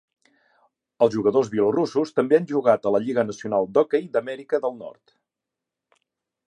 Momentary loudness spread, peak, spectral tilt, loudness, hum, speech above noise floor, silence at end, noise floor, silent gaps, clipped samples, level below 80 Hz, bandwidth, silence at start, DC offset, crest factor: 7 LU; -4 dBFS; -6.5 dB/octave; -22 LUFS; none; 64 dB; 1.55 s; -86 dBFS; none; under 0.1%; -68 dBFS; 9.6 kHz; 1 s; under 0.1%; 20 dB